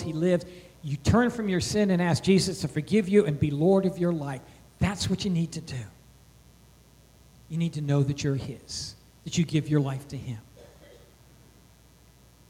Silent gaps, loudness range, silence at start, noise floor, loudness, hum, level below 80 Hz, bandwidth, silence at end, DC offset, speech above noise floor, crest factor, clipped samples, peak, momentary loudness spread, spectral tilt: none; 8 LU; 0 s; -56 dBFS; -27 LUFS; none; -50 dBFS; 15.5 kHz; 1.85 s; under 0.1%; 30 dB; 18 dB; under 0.1%; -10 dBFS; 16 LU; -6 dB/octave